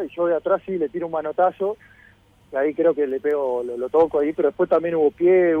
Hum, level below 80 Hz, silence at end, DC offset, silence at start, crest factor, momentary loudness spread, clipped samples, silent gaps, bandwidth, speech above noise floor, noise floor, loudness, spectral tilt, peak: none; -60 dBFS; 0 s; under 0.1%; 0 s; 14 dB; 8 LU; under 0.1%; none; 3.9 kHz; 33 dB; -53 dBFS; -21 LUFS; -8.5 dB/octave; -8 dBFS